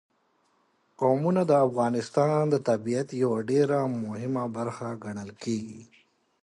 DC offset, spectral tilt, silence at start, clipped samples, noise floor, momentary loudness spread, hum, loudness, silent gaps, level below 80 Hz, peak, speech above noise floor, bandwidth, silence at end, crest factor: under 0.1%; -7.5 dB/octave; 1 s; under 0.1%; -69 dBFS; 12 LU; none; -27 LUFS; none; -70 dBFS; -10 dBFS; 43 dB; 11.5 kHz; 0.6 s; 18 dB